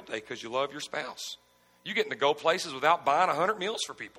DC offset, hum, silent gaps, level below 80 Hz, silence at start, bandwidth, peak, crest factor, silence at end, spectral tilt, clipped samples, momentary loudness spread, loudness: under 0.1%; none; none; -76 dBFS; 0 s; 16.5 kHz; -10 dBFS; 20 dB; 0 s; -2.5 dB/octave; under 0.1%; 13 LU; -29 LUFS